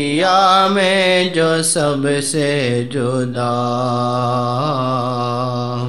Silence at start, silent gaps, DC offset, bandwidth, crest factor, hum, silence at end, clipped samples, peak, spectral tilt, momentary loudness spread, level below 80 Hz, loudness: 0 s; none; 0.9%; 13.5 kHz; 16 dB; none; 0 s; under 0.1%; 0 dBFS; -4.5 dB/octave; 7 LU; -56 dBFS; -16 LUFS